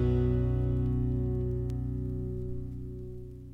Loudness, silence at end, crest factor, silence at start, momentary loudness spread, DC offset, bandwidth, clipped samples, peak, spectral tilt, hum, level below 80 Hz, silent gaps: -32 LUFS; 0 s; 12 dB; 0 s; 13 LU; under 0.1%; 3.9 kHz; under 0.1%; -18 dBFS; -11 dB/octave; 60 Hz at -60 dBFS; -36 dBFS; none